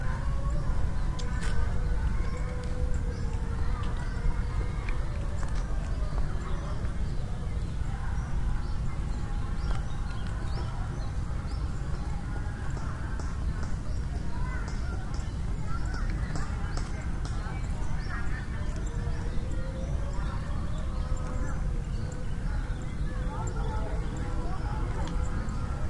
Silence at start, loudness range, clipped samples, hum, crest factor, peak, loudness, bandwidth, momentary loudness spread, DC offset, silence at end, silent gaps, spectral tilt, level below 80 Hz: 0 s; 2 LU; under 0.1%; none; 14 dB; -16 dBFS; -34 LUFS; 11 kHz; 3 LU; under 0.1%; 0 s; none; -6.5 dB/octave; -32 dBFS